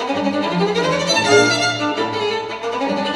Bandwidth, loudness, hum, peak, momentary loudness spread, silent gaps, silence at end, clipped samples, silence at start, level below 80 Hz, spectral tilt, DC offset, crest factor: 13 kHz; -17 LUFS; none; 0 dBFS; 9 LU; none; 0 s; under 0.1%; 0 s; -58 dBFS; -3.5 dB/octave; under 0.1%; 18 dB